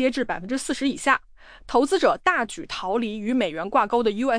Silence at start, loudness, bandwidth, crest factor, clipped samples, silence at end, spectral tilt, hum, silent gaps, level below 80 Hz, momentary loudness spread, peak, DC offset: 0 s; -23 LUFS; 10.5 kHz; 18 dB; under 0.1%; 0 s; -3.5 dB/octave; none; none; -50 dBFS; 7 LU; -6 dBFS; under 0.1%